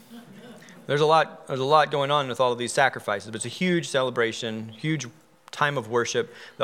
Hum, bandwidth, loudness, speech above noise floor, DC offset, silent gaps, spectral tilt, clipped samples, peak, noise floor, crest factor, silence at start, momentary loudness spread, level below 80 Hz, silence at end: none; 16 kHz; -24 LUFS; 22 dB; under 0.1%; none; -4 dB/octave; under 0.1%; -4 dBFS; -46 dBFS; 20 dB; 0.1 s; 12 LU; -80 dBFS; 0 s